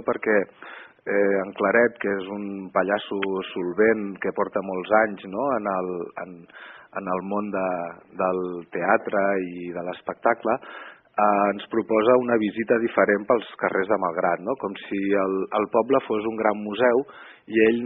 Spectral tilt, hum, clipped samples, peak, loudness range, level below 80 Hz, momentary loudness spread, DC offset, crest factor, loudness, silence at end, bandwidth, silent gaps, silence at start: -4 dB/octave; none; under 0.1%; -6 dBFS; 4 LU; -66 dBFS; 12 LU; under 0.1%; 18 dB; -24 LUFS; 0 s; 4 kHz; none; 0 s